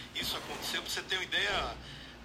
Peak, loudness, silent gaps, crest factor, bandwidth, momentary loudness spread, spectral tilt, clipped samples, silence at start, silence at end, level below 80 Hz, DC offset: -18 dBFS; -33 LUFS; none; 18 dB; 16 kHz; 11 LU; -1.5 dB/octave; under 0.1%; 0 s; 0 s; -54 dBFS; under 0.1%